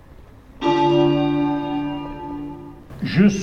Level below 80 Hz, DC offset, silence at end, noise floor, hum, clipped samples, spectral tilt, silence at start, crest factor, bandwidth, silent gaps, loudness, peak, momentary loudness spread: -44 dBFS; under 0.1%; 0 s; -44 dBFS; none; under 0.1%; -7 dB/octave; 0.2 s; 16 dB; 7.2 kHz; none; -20 LUFS; -4 dBFS; 16 LU